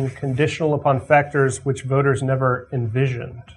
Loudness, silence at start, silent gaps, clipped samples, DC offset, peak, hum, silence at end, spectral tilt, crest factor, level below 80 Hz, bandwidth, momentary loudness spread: -20 LUFS; 0 s; none; under 0.1%; under 0.1%; -2 dBFS; none; 0.05 s; -6.5 dB/octave; 18 dB; -52 dBFS; 10.5 kHz; 7 LU